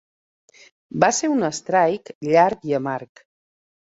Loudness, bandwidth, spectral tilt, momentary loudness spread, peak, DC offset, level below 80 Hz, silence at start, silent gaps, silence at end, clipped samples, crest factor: -20 LUFS; 8 kHz; -4.5 dB/octave; 11 LU; -2 dBFS; under 0.1%; -66 dBFS; 0.95 s; 2.15-2.21 s; 0.9 s; under 0.1%; 20 dB